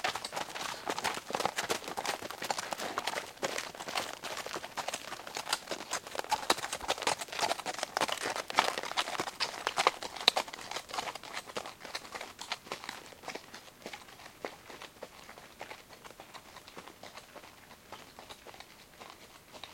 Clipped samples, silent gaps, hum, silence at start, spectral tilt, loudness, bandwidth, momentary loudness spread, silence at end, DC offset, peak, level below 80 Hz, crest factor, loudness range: under 0.1%; none; none; 0 s; -1 dB/octave; -35 LUFS; 17 kHz; 19 LU; 0 s; under 0.1%; -2 dBFS; -70 dBFS; 36 dB; 17 LU